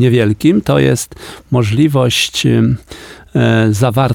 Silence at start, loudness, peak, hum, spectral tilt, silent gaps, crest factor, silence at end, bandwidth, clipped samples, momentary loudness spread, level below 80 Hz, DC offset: 0 s; -13 LUFS; 0 dBFS; none; -5.5 dB/octave; none; 12 dB; 0 s; 17.5 kHz; under 0.1%; 11 LU; -40 dBFS; under 0.1%